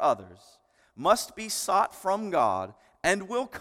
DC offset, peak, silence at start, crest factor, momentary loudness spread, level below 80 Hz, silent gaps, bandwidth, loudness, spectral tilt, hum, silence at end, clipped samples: under 0.1%; -6 dBFS; 0 s; 22 dB; 8 LU; -62 dBFS; none; 17.5 kHz; -27 LUFS; -3 dB/octave; none; 0 s; under 0.1%